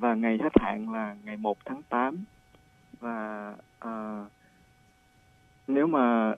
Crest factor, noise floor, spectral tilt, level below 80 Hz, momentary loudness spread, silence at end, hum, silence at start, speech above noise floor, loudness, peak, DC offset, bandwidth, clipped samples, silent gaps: 26 dB; -62 dBFS; -8 dB/octave; -56 dBFS; 18 LU; 0 s; none; 0 s; 34 dB; -29 LUFS; -4 dBFS; under 0.1%; 4 kHz; under 0.1%; none